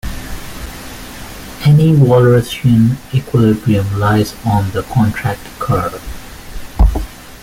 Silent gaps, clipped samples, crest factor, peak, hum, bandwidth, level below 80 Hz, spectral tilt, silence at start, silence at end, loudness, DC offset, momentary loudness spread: none; under 0.1%; 12 dB; -2 dBFS; none; 16.5 kHz; -24 dBFS; -7.5 dB/octave; 0.05 s; 0 s; -13 LUFS; under 0.1%; 20 LU